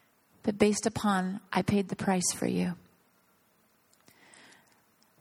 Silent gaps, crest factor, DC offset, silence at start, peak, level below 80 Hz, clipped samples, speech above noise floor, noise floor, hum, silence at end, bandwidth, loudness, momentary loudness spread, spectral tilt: none; 24 dB; under 0.1%; 0.45 s; -8 dBFS; -62 dBFS; under 0.1%; 39 dB; -68 dBFS; none; 2.4 s; 14.5 kHz; -29 LUFS; 9 LU; -4.5 dB/octave